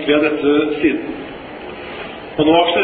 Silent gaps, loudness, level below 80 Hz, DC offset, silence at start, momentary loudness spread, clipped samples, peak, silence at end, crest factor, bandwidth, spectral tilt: none; -16 LUFS; -48 dBFS; under 0.1%; 0 s; 17 LU; under 0.1%; -2 dBFS; 0 s; 14 dB; 4.7 kHz; -9 dB/octave